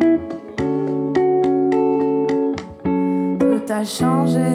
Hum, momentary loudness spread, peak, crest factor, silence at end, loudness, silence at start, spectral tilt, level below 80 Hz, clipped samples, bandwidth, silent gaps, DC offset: none; 6 LU; -4 dBFS; 14 dB; 0 s; -19 LUFS; 0 s; -7 dB/octave; -52 dBFS; under 0.1%; 15 kHz; none; under 0.1%